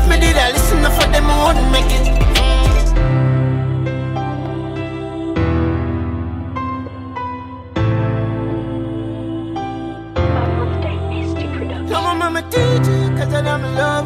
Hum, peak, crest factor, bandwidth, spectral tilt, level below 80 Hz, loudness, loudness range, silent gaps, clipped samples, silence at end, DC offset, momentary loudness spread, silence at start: none; -2 dBFS; 14 dB; 16 kHz; -5.5 dB/octave; -20 dBFS; -18 LUFS; 7 LU; none; under 0.1%; 0 s; under 0.1%; 11 LU; 0 s